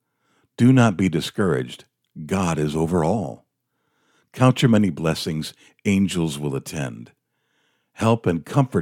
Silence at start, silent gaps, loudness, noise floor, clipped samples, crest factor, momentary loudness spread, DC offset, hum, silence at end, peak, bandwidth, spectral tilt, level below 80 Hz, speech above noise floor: 0.6 s; none; -21 LUFS; -73 dBFS; under 0.1%; 18 dB; 14 LU; under 0.1%; none; 0 s; -4 dBFS; 16 kHz; -6.5 dB/octave; -54 dBFS; 53 dB